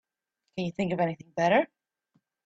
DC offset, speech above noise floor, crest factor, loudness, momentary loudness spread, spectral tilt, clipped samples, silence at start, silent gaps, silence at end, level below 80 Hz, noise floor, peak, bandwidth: under 0.1%; 56 dB; 20 dB; -28 LUFS; 12 LU; -6.5 dB/octave; under 0.1%; 0.55 s; none; 0.8 s; -68 dBFS; -83 dBFS; -10 dBFS; 8 kHz